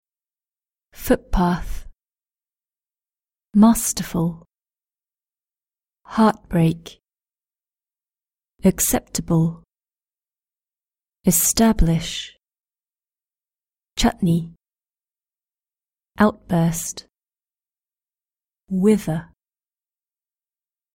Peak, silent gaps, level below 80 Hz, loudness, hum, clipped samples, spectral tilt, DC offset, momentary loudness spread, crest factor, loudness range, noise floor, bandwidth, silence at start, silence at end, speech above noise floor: -2 dBFS; 12.60-12.64 s; -36 dBFS; -20 LUFS; none; under 0.1%; -5 dB/octave; under 0.1%; 14 LU; 22 dB; 5 LU; under -90 dBFS; 16.5 kHz; 1 s; 1.7 s; over 71 dB